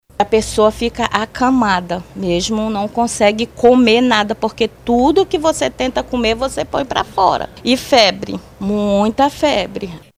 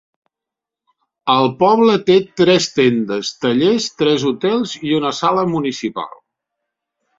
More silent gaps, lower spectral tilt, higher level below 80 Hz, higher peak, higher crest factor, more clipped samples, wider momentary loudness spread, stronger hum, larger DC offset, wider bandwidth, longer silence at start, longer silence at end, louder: neither; about the same, -4 dB/octave vs -5 dB/octave; first, -38 dBFS vs -58 dBFS; about the same, 0 dBFS vs -2 dBFS; about the same, 16 dB vs 16 dB; neither; about the same, 8 LU vs 9 LU; neither; neither; first, 16 kHz vs 7.8 kHz; second, 0.2 s vs 1.25 s; second, 0.2 s vs 1.1 s; about the same, -15 LUFS vs -16 LUFS